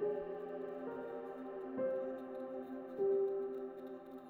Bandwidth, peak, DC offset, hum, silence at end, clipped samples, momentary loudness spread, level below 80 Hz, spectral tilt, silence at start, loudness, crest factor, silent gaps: 4.2 kHz; -28 dBFS; under 0.1%; none; 0 s; under 0.1%; 10 LU; -80 dBFS; -8.5 dB/octave; 0 s; -42 LUFS; 14 dB; none